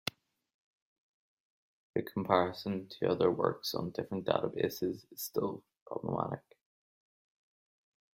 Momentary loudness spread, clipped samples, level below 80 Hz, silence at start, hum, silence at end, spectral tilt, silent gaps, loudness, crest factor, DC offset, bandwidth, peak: 11 LU; under 0.1%; -72 dBFS; 0.05 s; none; 1.8 s; -5.5 dB/octave; 0.54-1.94 s, 5.81-5.86 s; -35 LUFS; 26 dB; under 0.1%; 16 kHz; -10 dBFS